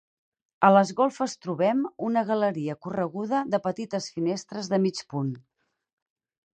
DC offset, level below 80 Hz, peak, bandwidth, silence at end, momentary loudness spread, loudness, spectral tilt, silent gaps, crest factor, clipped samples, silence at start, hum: under 0.1%; -72 dBFS; -6 dBFS; 9.2 kHz; 1.15 s; 12 LU; -26 LUFS; -6 dB/octave; none; 22 dB; under 0.1%; 0.6 s; none